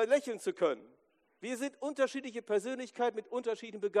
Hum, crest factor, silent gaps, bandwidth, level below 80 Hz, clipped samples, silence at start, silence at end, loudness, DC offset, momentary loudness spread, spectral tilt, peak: none; 18 dB; none; 14 kHz; -90 dBFS; under 0.1%; 0 s; 0 s; -35 LUFS; under 0.1%; 9 LU; -4 dB/octave; -16 dBFS